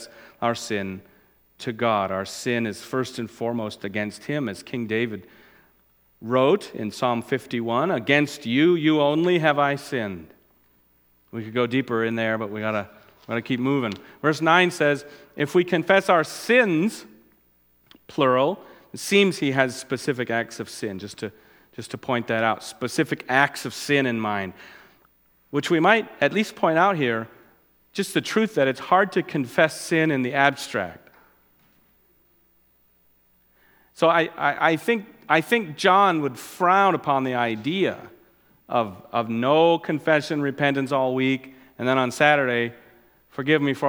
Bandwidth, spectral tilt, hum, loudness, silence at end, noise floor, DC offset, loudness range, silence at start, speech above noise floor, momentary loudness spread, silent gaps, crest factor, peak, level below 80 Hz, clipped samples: 19.5 kHz; -5 dB/octave; none; -23 LUFS; 0 s; -62 dBFS; under 0.1%; 6 LU; 0 s; 40 dB; 13 LU; none; 22 dB; -2 dBFS; -68 dBFS; under 0.1%